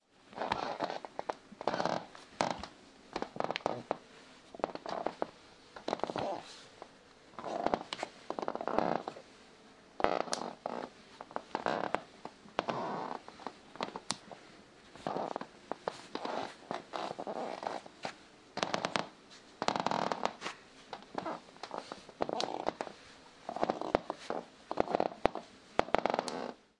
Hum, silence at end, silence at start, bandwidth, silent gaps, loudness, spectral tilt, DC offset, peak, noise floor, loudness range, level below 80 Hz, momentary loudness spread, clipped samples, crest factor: none; 0.25 s; 0.25 s; 11.5 kHz; none; -38 LUFS; -4 dB/octave; under 0.1%; -6 dBFS; -59 dBFS; 4 LU; -66 dBFS; 19 LU; under 0.1%; 32 dB